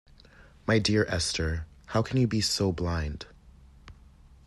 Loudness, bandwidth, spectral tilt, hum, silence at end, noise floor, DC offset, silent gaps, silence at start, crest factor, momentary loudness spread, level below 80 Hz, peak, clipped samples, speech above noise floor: -28 LUFS; 12.5 kHz; -4.5 dB/octave; none; 0.55 s; -54 dBFS; under 0.1%; none; 0.4 s; 18 dB; 12 LU; -46 dBFS; -12 dBFS; under 0.1%; 27 dB